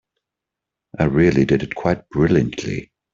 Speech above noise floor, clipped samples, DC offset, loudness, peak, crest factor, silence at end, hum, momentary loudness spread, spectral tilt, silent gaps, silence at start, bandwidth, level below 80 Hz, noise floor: 67 dB; under 0.1%; under 0.1%; -19 LUFS; -2 dBFS; 16 dB; 0.3 s; none; 12 LU; -7.5 dB/octave; none; 1 s; 7.6 kHz; -42 dBFS; -84 dBFS